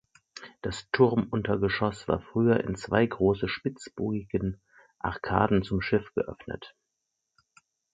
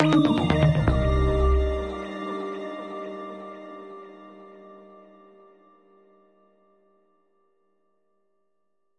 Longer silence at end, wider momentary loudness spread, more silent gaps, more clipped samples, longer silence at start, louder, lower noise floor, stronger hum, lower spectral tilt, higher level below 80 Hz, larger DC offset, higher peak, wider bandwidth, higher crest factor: second, 1.25 s vs 4.15 s; second, 15 LU vs 25 LU; neither; neither; first, 0.35 s vs 0 s; second, -28 LUFS vs -25 LUFS; about the same, -82 dBFS vs -79 dBFS; neither; about the same, -7 dB/octave vs -8 dB/octave; second, -50 dBFS vs -32 dBFS; neither; about the same, -6 dBFS vs -6 dBFS; second, 9.2 kHz vs 11 kHz; about the same, 24 dB vs 22 dB